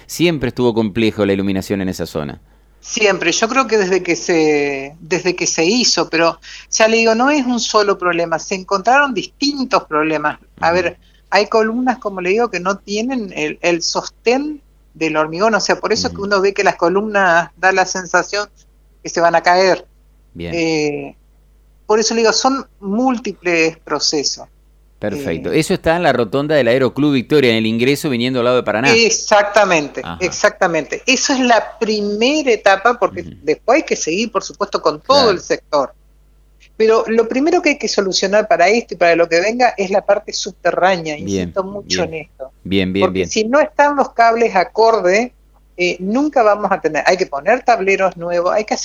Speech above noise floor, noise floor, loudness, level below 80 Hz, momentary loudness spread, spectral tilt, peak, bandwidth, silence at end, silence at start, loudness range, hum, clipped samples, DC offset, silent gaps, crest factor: 34 dB; -49 dBFS; -15 LUFS; -48 dBFS; 9 LU; -3.5 dB/octave; 0 dBFS; 16 kHz; 0 s; 0.1 s; 4 LU; none; under 0.1%; under 0.1%; none; 16 dB